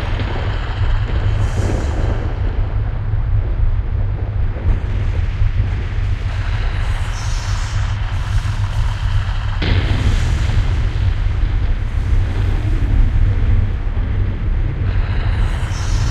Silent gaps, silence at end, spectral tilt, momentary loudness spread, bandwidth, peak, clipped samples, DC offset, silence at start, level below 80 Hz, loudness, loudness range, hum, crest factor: none; 0 s; -6.5 dB/octave; 4 LU; 8.8 kHz; -4 dBFS; under 0.1%; under 0.1%; 0 s; -18 dBFS; -20 LUFS; 2 LU; none; 12 dB